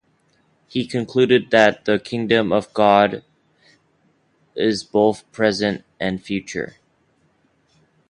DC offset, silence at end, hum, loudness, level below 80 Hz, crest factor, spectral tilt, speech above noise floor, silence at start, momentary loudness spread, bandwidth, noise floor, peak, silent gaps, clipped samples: under 0.1%; 1.45 s; none; -19 LUFS; -56 dBFS; 20 dB; -5.5 dB/octave; 44 dB; 0.75 s; 13 LU; 11 kHz; -62 dBFS; 0 dBFS; none; under 0.1%